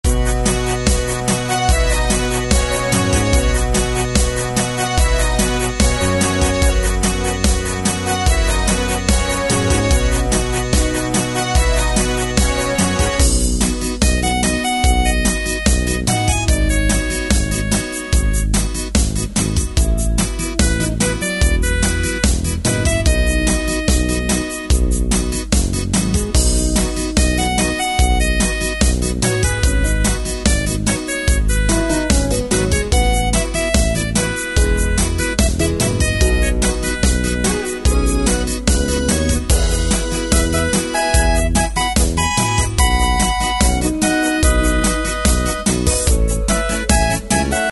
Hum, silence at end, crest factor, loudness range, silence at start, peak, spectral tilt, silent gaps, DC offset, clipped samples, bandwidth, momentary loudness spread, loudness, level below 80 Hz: none; 0 s; 16 dB; 1 LU; 0.05 s; 0 dBFS; -4 dB/octave; none; under 0.1%; under 0.1%; 12 kHz; 3 LU; -17 LUFS; -18 dBFS